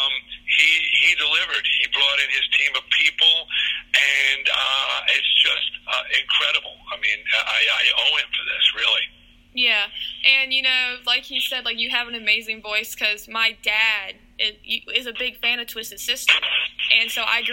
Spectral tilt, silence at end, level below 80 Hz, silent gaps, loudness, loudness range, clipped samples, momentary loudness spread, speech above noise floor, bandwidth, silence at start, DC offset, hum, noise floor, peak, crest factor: 1.5 dB/octave; 0 s; -56 dBFS; none; -18 LUFS; 4 LU; under 0.1%; 9 LU; 26 dB; 17 kHz; 0 s; under 0.1%; none; -49 dBFS; 0 dBFS; 20 dB